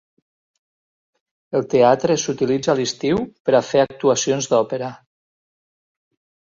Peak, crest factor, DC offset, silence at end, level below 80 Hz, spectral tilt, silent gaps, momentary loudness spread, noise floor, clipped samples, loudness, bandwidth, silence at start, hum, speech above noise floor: -2 dBFS; 18 dB; under 0.1%; 1.55 s; -58 dBFS; -4.5 dB/octave; 3.40-3.45 s; 9 LU; under -90 dBFS; under 0.1%; -19 LUFS; 7.6 kHz; 1.5 s; none; over 72 dB